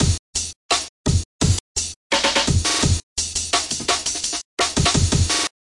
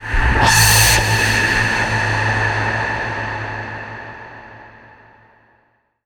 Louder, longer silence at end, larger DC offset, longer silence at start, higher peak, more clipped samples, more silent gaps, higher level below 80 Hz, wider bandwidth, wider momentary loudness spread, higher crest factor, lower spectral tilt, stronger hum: second, -20 LUFS vs -15 LUFS; second, 0.15 s vs 1.35 s; neither; about the same, 0 s vs 0 s; second, -4 dBFS vs 0 dBFS; neither; first, 0.19-0.33 s, 0.56-0.69 s, 0.89-1.04 s, 1.25-1.39 s, 1.60-1.75 s, 1.96-2.10 s, 3.03-3.16 s, 4.45-4.57 s vs none; second, -34 dBFS vs -28 dBFS; second, 11.5 kHz vs over 20 kHz; second, 6 LU vs 20 LU; about the same, 16 dB vs 18 dB; about the same, -3 dB/octave vs -2.5 dB/octave; neither